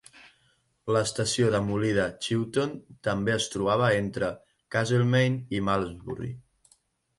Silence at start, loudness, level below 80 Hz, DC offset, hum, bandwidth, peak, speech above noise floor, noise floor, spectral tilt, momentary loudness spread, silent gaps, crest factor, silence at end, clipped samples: 0.15 s; -27 LUFS; -54 dBFS; under 0.1%; none; 11.5 kHz; -10 dBFS; 42 dB; -68 dBFS; -5 dB/octave; 13 LU; none; 18 dB; 0.8 s; under 0.1%